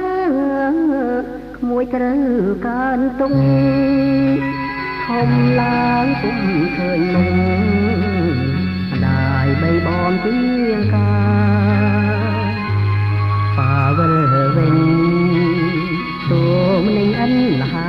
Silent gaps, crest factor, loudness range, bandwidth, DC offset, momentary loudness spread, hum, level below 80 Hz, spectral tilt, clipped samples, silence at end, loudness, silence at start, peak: none; 12 dB; 2 LU; 5.8 kHz; under 0.1%; 5 LU; 50 Hz at -35 dBFS; -38 dBFS; -9.5 dB/octave; under 0.1%; 0 s; -16 LUFS; 0 s; -4 dBFS